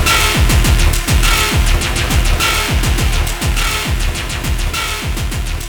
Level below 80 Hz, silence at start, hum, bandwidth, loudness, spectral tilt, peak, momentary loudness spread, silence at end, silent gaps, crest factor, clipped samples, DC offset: -16 dBFS; 0 s; none; over 20 kHz; -15 LUFS; -3.5 dB/octave; 0 dBFS; 7 LU; 0 s; none; 14 dB; under 0.1%; under 0.1%